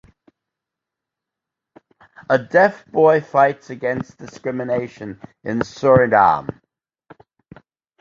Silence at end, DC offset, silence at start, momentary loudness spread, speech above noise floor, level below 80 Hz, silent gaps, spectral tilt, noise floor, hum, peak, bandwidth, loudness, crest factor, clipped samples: 1.55 s; under 0.1%; 2.2 s; 18 LU; 67 dB; -54 dBFS; none; -7 dB/octave; -85 dBFS; none; -2 dBFS; 7.4 kHz; -17 LUFS; 18 dB; under 0.1%